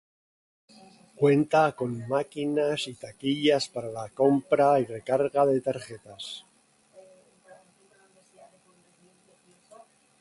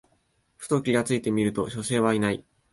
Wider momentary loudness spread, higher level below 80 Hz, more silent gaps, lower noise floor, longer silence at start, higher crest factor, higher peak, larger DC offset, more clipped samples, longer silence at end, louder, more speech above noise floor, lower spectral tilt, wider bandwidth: first, 16 LU vs 6 LU; second, -70 dBFS vs -58 dBFS; neither; second, -63 dBFS vs -69 dBFS; first, 1.2 s vs 0.6 s; about the same, 20 dB vs 18 dB; about the same, -8 dBFS vs -10 dBFS; neither; neither; first, 3.8 s vs 0.3 s; about the same, -26 LUFS vs -26 LUFS; second, 37 dB vs 44 dB; about the same, -6 dB/octave vs -5.5 dB/octave; about the same, 11.5 kHz vs 12 kHz